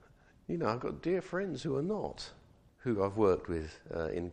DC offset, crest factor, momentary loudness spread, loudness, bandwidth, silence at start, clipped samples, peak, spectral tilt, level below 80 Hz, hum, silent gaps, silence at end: under 0.1%; 20 dB; 12 LU; -35 LUFS; 10 kHz; 0.5 s; under 0.1%; -16 dBFS; -7 dB/octave; -56 dBFS; none; none; 0 s